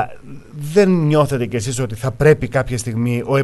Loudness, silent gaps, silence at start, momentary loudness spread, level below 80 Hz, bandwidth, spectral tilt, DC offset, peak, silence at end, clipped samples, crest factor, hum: -17 LUFS; none; 0 s; 9 LU; -40 dBFS; 12.5 kHz; -6.5 dB/octave; under 0.1%; 0 dBFS; 0 s; under 0.1%; 16 dB; none